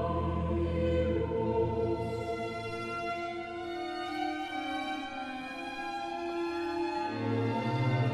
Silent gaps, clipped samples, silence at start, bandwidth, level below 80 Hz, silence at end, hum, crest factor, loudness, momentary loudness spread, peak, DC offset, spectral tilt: none; under 0.1%; 0 s; 12.5 kHz; -46 dBFS; 0 s; none; 14 dB; -34 LUFS; 8 LU; -20 dBFS; under 0.1%; -7 dB/octave